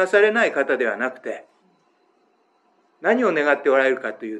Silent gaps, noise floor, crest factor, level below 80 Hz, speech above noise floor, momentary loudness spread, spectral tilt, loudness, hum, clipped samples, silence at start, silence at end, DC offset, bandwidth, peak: none; -63 dBFS; 18 dB; -90 dBFS; 43 dB; 12 LU; -4.5 dB/octave; -20 LUFS; none; under 0.1%; 0 s; 0 s; under 0.1%; 10 kHz; -2 dBFS